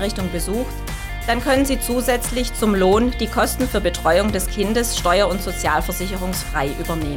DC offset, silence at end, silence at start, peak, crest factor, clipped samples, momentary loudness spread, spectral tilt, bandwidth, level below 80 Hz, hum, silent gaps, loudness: under 0.1%; 0 s; 0 s; -6 dBFS; 14 dB; under 0.1%; 7 LU; -4 dB/octave; 18 kHz; -28 dBFS; none; none; -20 LUFS